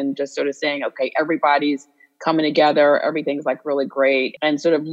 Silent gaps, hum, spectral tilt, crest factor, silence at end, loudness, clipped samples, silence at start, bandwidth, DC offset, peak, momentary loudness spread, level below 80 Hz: none; none; -5 dB/octave; 16 dB; 0 s; -19 LUFS; under 0.1%; 0 s; 8.2 kHz; under 0.1%; -2 dBFS; 8 LU; -82 dBFS